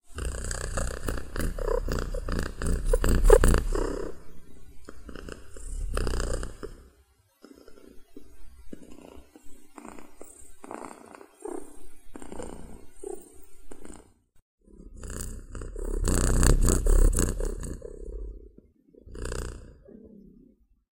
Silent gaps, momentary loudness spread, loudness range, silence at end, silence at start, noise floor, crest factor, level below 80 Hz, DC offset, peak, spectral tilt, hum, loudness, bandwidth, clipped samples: 14.42-14.58 s; 26 LU; 20 LU; 0.9 s; 0.1 s; -63 dBFS; 28 dB; -30 dBFS; under 0.1%; 0 dBFS; -5 dB/octave; none; -30 LUFS; 16.5 kHz; under 0.1%